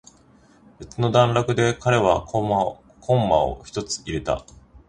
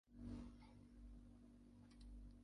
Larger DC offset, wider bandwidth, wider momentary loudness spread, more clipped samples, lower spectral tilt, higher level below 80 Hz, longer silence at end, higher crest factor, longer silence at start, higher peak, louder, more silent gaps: neither; second, 9.8 kHz vs 11 kHz; about the same, 10 LU vs 11 LU; neither; second, -5.5 dB/octave vs -7.5 dB/octave; first, -44 dBFS vs -64 dBFS; about the same, 0.1 s vs 0 s; about the same, 20 dB vs 16 dB; first, 0.8 s vs 0.05 s; first, -2 dBFS vs -42 dBFS; first, -22 LUFS vs -61 LUFS; neither